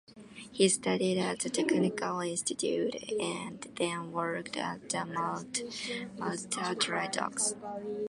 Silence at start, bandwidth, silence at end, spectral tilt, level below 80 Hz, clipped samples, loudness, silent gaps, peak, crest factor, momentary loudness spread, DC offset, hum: 0.1 s; 11.5 kHz; 0 s; -3.5 dB/octave; -72 dBFS; under 0.1%; -32 LUFS; none; -12 dBFS; 20 dB; 8 LU; under 0.1%; none